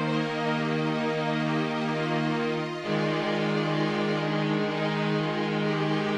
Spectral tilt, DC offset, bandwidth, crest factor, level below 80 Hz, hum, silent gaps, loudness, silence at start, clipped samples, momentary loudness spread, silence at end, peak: -6.5 dB/octave; under 0.1%; 10 kHz; 12 dB; -66 dBFS; none; none; -27 LUFS; 0 s; under 0.1%; 2 LU; 0 s; -16 dBFS